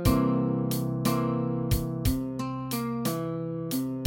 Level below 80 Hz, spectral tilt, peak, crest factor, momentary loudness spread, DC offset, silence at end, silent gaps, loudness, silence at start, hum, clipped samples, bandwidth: -40 dBFS; -6.5 dB/octave; -10 dBFS; 18 dB; 6 LU; under 0.1%; 0 s; none; -29 LUFS; 0 s; none; under 0.1%; 17 kHz